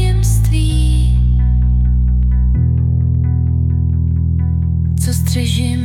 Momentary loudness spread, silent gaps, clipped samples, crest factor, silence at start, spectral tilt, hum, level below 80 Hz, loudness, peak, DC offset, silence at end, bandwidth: 2 LU; none; under 0.1%; 8 dB; 0 s; -6.5 dB/octave; none; -16 dBFS; -15 LUFS; -4 dBFS; under 0.1%; 0 s; 15.5 kHz